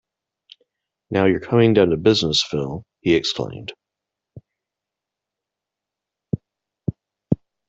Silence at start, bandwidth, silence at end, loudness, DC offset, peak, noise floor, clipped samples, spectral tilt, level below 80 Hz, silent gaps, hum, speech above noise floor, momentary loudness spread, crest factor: 1.1 s; 8.2 kHz; 0.35 s; -20 LUFS; under 0.1%; -2 dBFS; -85 dBFS; under 0.1%; -5.5 dB/octave; -52 dBFS; none; none; 67 dB; 15 LU; 20 dB